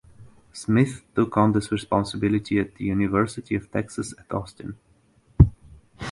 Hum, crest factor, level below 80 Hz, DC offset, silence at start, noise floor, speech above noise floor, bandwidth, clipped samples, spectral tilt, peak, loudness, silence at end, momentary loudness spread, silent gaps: none; 24 dB; -36 dBFS; under 0.1%; 0.2 s; -59 dBFS; 35 dB; 11.5 kHz; under 0.1%; -7 dB/octave; 0 dBFS; -24 LUFS; 0 s; 18 LU; none